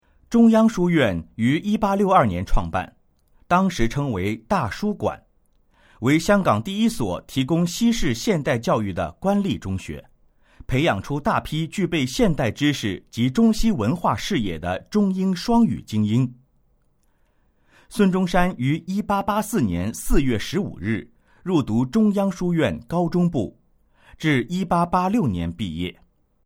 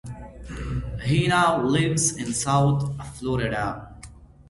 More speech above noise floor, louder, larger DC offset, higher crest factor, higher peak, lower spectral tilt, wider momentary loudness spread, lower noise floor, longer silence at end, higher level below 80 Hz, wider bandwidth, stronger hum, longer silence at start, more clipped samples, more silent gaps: first, 42 dB vs 23 dB; about the same, -22 LUFS vs -23 LUFS; neither; about the same, 18 dB vs 18 dB; first, -2 dBFS vs -6 dBFS; first, -6 dB/octave vs -4.5 dB/octave; second, 9 LU vs 18 LU; first, -62 dBFS vs -46 dBFS; first, 0.55 s vs 0.05 s; first, -36 dBFS vs -42 dBFS; first, 16.5 kHz vs 11.5 kHz; neither; first, 0.3 s vs 0.05 s; neither; neither